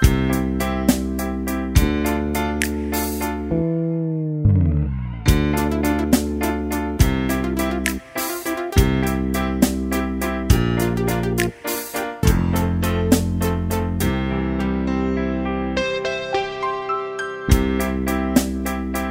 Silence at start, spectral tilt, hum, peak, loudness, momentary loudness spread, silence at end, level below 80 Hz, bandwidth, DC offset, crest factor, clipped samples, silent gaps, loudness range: 0 s; -6 dB/octave; none; 0 dBFS; -21 LUFS; 6 LU; 0 s; -28 dBFS; 16.5 kHz; under 0.1%; 20 dB; under 0.1%; none; 2 LU